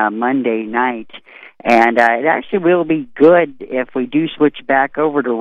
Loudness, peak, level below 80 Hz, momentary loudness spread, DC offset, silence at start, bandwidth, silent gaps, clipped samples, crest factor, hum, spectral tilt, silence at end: -15 LUFS; 0 dBFS; -56 dBFS; 9 LU; under 0.1%; 0 s; 9.2 kHz; none; under 0.1%; 14 dB; none; -7 dB/octave; 0 s